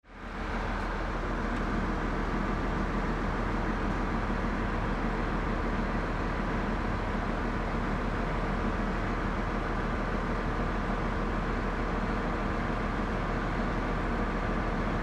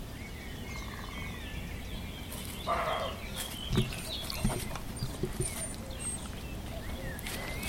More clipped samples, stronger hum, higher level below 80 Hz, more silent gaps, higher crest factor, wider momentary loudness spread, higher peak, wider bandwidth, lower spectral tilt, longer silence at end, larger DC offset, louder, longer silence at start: neither; neither; first, -34 dBFS vs -42 dBFS; neither; second, 12 dB vs 22 dB; second, 1 LU vs 9 LU; about the same, -18 dBFS vs -16 dBFS; second, 8.8 kHz vs 17 kHz; first, -7 dB/octave vs -4 dB/octave; about the same, 0 s vs 0 s; neither; first, -32 LUFS vs -37 LUFS; about the same, 0.05 s vs 0 s